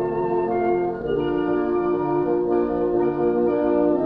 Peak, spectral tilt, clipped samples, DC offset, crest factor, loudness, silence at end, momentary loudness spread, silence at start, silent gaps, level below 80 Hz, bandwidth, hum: -10 dBFS; -10 dB/octave; under 0.1%; under 0.1%; 12 dB; -22 LUFS; 0 s; 3 LU; 0 s; none; -48 dBFS; 4.1 kHz; none